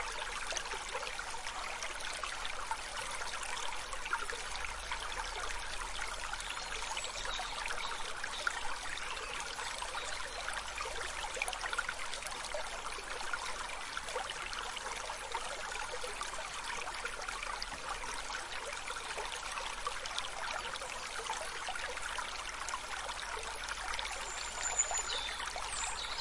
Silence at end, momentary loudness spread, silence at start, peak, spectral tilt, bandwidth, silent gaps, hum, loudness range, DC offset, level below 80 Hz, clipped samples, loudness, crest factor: 0 s; 3 LU; 0 s; -18 dBFS; 0 dB/octave; 11.5 kHz; none; none; 3 LU; under 0.1%; -52 dBFS; under 0.1%; -39 LUFS; 22 dB